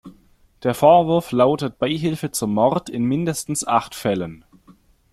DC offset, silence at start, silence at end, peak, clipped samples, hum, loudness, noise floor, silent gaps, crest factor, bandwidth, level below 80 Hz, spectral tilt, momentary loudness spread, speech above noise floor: under 0.1%; 0.05 s; 0.75 s; -2 dBFS; under 0.1%; none; -20 LUFS; -54 dBFS; none; 18 dB; 15.5 kHz; -54 dBFS; -5.5 dB/octave; 10 LU; 35 dB